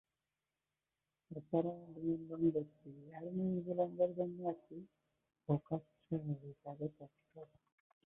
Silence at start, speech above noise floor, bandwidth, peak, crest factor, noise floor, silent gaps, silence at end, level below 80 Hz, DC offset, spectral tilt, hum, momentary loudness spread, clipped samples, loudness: 1.3 s; over 49 dB; 3.8 kHz; -22 dBFS; 20 dB; under -90 dBFS; none; 0.7 s; -76 dBFS; under 0.1%; -10 dB/octave; none; 20 LU; under 0.1%; -41 LUFS